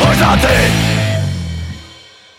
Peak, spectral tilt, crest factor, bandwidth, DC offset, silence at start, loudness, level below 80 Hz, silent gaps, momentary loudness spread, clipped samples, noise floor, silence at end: 0 dBFS; -5 dB/octave; 14 dB; 16.5 kHz; under 0.1%; 0 s; -13 LUFS; -24 dBFS; none; 16 LU; under 0.1%; -40 dBFS; 0.45 s